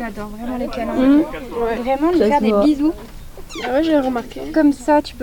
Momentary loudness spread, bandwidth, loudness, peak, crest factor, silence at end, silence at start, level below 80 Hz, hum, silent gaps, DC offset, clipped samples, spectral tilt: 13 LU; 18 kHz; -18 LUFS; -4 dBFS; 14 dB; 0 s; 0 s; -38 dBFS; none; none; 0.1%; under 0.1%; -6 dB/octave